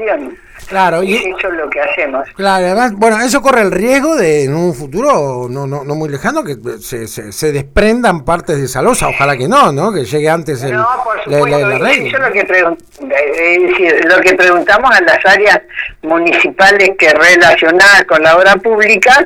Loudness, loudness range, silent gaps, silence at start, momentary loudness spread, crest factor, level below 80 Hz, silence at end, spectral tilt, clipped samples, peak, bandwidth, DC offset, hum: -9 LUFS; 8 LU; none; 0 s; 12 LU; 10 dB; -36 dBFS; 0 s; -4 dB/octave; under 0.1%; 0 dBFS; 18.5 kHz; under 0.1%; none